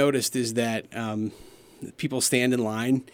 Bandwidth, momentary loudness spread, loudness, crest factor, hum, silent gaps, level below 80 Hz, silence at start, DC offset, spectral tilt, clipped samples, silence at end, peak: 17.5 kHz; 12 LU; -26 LUFS; 20 dB; none; none; -64 dBFS; 0 s; under 0.1%; -4 dB/octave; under 0.1%; 0.1 s; -8 dBFS